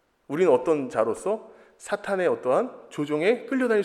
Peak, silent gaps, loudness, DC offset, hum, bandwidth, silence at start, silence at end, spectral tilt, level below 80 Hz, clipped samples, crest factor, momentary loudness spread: -8 dBFS; none; -25 LUFS; under 0.1%; none; 12.5 kHz; 0.3 s; 0 s; -5.5 dB/octave; -70 dBFS; under 0.1%; 18 dB; 11 LU